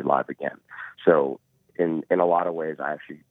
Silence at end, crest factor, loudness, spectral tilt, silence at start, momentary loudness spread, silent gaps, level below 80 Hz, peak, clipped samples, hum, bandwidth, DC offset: 0.15 s; 22 dB; -24 LUFS; -9 dB/octave; 0 s; 19 LU; none; -76 dBFS; -4 dBFS; under 0.1%; none; 4 kHz; under 0.1%